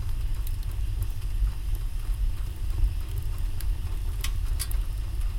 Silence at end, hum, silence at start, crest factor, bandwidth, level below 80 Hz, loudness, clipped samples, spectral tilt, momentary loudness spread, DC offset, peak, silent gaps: 0 s; none; 0 s; 14 dB; 17 kHz; -28 dBFS; -33 LUFS; under 0.1%; -4.5 dB/octave; 3 LU; under 0.1%; -14 dBFS; none